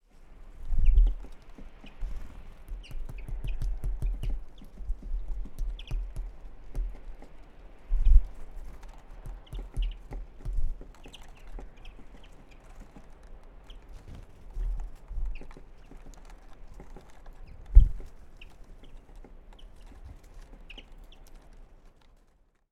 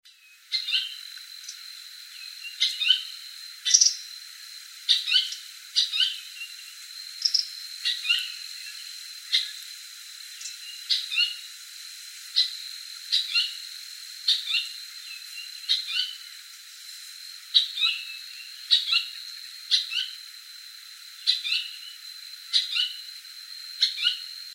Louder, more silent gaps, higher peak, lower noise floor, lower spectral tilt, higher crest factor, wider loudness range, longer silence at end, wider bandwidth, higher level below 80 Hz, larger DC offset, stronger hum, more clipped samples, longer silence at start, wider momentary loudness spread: second, -34 LUFS vs -24 LUFS; neither; about the same, -2 dBFS vs 0 dBFS; first, -64 dBFS vs -50 dBFS; first, -7 dB/octave vs 12.5 dB/octave; about the same, 28 dB vs 30 dB; first, 19 LU vs 5 LU; first, 1.1 s vs 0 s; second, 3.8 kHz vs 16.5 kHz; first, -30 dBFS vs under -90 dBFS; neither; neither; neither; first, 0.2 s vs 0.05 s; first, 26 LU vs 18 LU